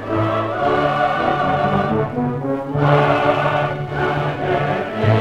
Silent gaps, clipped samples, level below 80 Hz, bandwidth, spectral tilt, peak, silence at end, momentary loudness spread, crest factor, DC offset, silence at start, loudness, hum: none; under 0.1%; -44 dBFS; 8.8 kHz; -8 dB/octave; -2 dBFS; 0 s; 6 LU; 16 dB; under 0.1%; 0 s; -18 LUFS; none